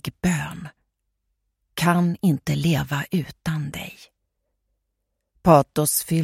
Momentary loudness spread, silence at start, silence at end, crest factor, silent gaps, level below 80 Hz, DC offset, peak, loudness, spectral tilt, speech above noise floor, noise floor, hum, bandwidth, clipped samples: 18 LU; 0.05 s; 0 s; 22 dB; none; -50 dBFS; under 0.1%; -2 dBFS; -22 LUFS; -5.5 dB/octave; 57 dB; -78 dBFS; none; 16.5 kHz; under 0.1%